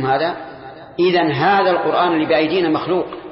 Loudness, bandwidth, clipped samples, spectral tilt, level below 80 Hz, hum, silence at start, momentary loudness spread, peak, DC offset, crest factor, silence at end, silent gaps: -17 LUFS; 5.8 kHz; under 0.1%; -10.5 dB/octave; -56 dBFS; none; 0 s; 16 LU; -4 dBFS; under 0.1%; 12 dB; 0 s; none